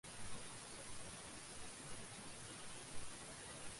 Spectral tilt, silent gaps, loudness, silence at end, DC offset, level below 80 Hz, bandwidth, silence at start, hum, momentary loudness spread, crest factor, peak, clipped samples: -2 dB/octave; none; -52 LUFS; 0 s; under 0.1%; -66 dBFS; 11.5 kHz; 0.05 s; none; 1 LU; 16 dB; -34 dBFS; under 0.1%